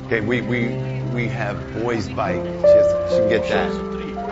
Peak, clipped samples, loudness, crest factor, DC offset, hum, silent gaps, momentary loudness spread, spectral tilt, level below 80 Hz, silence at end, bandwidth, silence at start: -4 dBFS; under 0.1%; -20 LUFS; 16 dB; under 0.1%; none; none; 11 LU; -7 dB/octave; -42 dBFS; 0 s; 8 kHz; 0 s